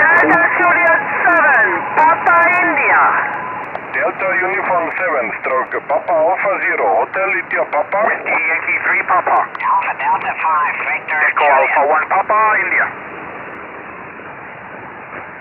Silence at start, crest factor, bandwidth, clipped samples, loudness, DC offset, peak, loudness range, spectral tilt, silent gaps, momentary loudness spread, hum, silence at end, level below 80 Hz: 0 s; 14 dB; 7 kHz; under 0.1%; -14 LUFS; under 0.1%; 0 dBFS; 5 LU; -6.5 dB/octave; none; 19 LU; none; 0 s; -60 dBFS